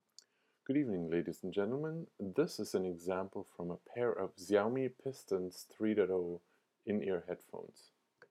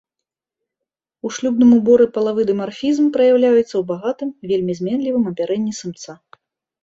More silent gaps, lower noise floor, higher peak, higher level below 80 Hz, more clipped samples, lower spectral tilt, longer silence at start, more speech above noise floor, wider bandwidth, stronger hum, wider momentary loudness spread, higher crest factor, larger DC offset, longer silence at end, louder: neither; second, -66 dBFS vs -84 dBFS; second, -18 dBFS vs -2 dBFS; second, -78 dBFS vs -60 dBFS; neither; about the same, -6.5 dB/octave vs -6 dB/octave; second, 0.7 s vs 1.25 s; second, 29 dB vs 68 dB; first, 15.5 kHz vs 7.8 kHz; neither; second, 12 LU vs 15 LU; about the same, 20 dB vs 16 dB; neither; second, 0.5 s vs 0.7 s; second, -38 LUFS vs -17 LUFS